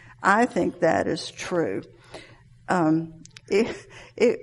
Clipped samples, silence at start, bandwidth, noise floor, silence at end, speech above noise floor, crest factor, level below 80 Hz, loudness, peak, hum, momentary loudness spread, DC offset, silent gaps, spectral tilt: under 0.1%; 0.2 s; 11.5 kHz; -49 dBFS; 0 s; 26 dB; 20 dB; -60 dBFS; -24 LUFS; -6 dBFS; none; 23 LU; under 0.1%; none; -5.5 dB/octave